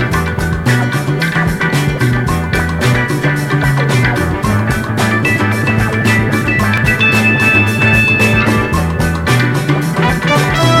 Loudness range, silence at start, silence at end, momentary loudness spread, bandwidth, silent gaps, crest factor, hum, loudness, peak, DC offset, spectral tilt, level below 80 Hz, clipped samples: 3 LU; 0 s; 0 s; 6 LU; 16 kHz; none; 12 dB; none; -12 LUFS; 0 dBFS; under 0.1%; -5.5 dB/octave; -28 dBFS; under 0.1%